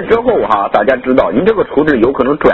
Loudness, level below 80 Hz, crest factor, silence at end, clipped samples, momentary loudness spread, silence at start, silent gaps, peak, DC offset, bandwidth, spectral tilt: -11 LUFS; -38 dBFS; 10 dB; 0 s; 0.4%; 1 LU; 0 s; none; 0 dBFS; under 0.1%; 6.2 kHz; -8 dB/octave